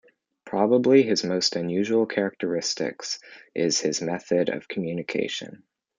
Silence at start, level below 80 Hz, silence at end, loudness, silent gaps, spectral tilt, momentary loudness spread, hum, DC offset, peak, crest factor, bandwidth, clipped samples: 0.45 s; -72 dBFS; 0.4 s; -24 LUFS; none; -4 dB/octave; 13 LU; none; under 0.1%; -6 dBFS; 18 dB; 9.6 kHz; under 0.1%